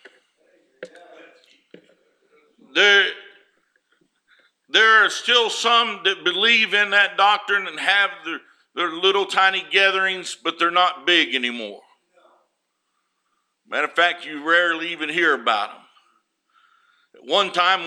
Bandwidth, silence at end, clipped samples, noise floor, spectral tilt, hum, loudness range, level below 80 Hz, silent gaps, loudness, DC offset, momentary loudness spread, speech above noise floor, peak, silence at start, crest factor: 13 kHz; 0 s; under 0.1%; -74 dBFS; -1 dB/octave; none; 6 LU; -86 dBFS; none; -18 LUFS; under 0.1%; 12 LU; 54 dB; -2 dBFS; 0.8 s; 20 dB